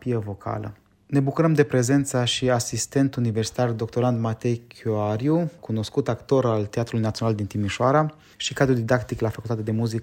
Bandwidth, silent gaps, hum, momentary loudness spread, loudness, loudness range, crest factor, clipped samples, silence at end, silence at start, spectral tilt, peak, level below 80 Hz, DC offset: 16 kHz; none; none; 9 LU; -24 LUFS; 2 LU; 18 dB; under 0.1%; 0 s; 0 s; -5.5 dB/octave; -4 dBFS; -54 dBFS; under 0.1%